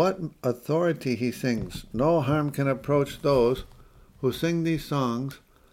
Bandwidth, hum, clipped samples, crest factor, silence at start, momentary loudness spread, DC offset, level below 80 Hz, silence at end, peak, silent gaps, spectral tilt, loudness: 16.5 kHz; none; under 0.1%; 16 dB; 0 s; 8 LU; under 0.1%; -50 dBFS; 0.35 s; -10 dBFS; none; -7 dB/octave; -26 LUFS